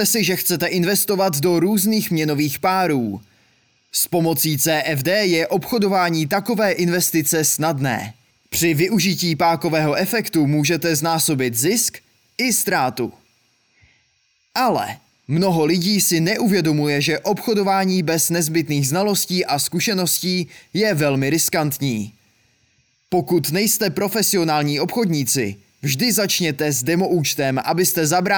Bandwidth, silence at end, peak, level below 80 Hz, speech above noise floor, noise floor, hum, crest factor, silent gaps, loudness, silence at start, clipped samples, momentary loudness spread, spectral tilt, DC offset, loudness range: over 20 kHz; 0 s; -6 dBFS; -60 dBFS; 45 dB; -64 dBFS; none; 14 dB; none; -18 LUFS; 0 s; under 0.1%; 6 LU; -4 dB/octave; under 0.1%; 3 LU